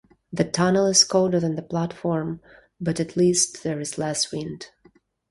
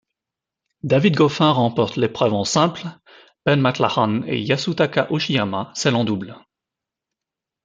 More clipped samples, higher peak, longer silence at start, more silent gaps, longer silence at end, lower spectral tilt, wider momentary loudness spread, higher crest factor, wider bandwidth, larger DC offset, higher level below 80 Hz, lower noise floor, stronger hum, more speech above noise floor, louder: neither; about the same, -4 dBFS vs -2 dBFS; second, 0.3 s vs 0.85 s; neither; second, 0.65 s vs 1.25 s; second, -4 dB/octave vs -5.5 dB/octave; first, 17 LU vs 8 LU; about the same, 20 dB vs 20 dB; first, 11.5 kHz vs 9.4 kHz; neither; about the same, -58 dBFS vs -60 dBFS; second, -58 dBFS vs -86 dBFS; neither; second, 36 dB vs 67 dB; second, -22 LUFS vs -19 LUFS